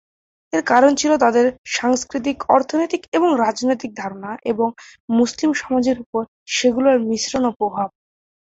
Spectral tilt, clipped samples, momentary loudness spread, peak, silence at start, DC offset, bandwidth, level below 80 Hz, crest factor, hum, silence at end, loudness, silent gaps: -3.5 dB/octave; under 0.1%; 11 LU; -2 dBFS; 0.55 s; under 0.1%; 8 kHz; -56 dBFS; 18 dB; none; 0.6 s; -19 LUFS; 1.58-1.64 s, 3.08-3.12 s, 5.00-5.08 s, 6.06-6.13 s, 6.28-6.46 s, 7.56-7.60 s